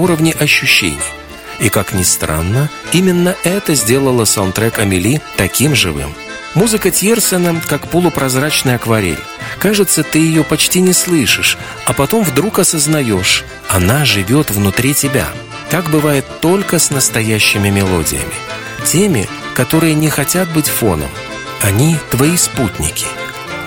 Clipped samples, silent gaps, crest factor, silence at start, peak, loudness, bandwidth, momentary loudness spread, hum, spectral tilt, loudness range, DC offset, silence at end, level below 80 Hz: under 0.1%; none; 12 dB; 0 s; 0 dBFS; -12 LUFS; 19.5 kHz; 8 LU; none; -4 dB/octave; 2 LU; under 0.1%; 0 s; -36 dBFS